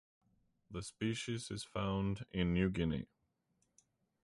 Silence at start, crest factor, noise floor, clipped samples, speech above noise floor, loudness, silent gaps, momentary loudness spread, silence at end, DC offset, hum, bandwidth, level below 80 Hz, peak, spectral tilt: 0.7 s; 20 dB; -81 dBFS; under 0.1%; 43 dB; -39 LUFS; none; 13 LU; 1.2 s; under 0.1%; none; 11.5 kHz; -56 dBFS; -22 dBFS; -6 dB/octave